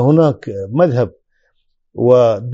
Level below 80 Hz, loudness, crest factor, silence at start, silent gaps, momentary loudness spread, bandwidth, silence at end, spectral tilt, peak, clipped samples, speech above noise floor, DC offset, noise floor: -54 dBFS; -14 LUFS; 14 dB; 0 s; none; 12 LU; 7.6 kHz; 0 s; -8.5 dB/octave; 0 dBFS; under 0.1%; 49 dB; under 0.1%; -62 dBFS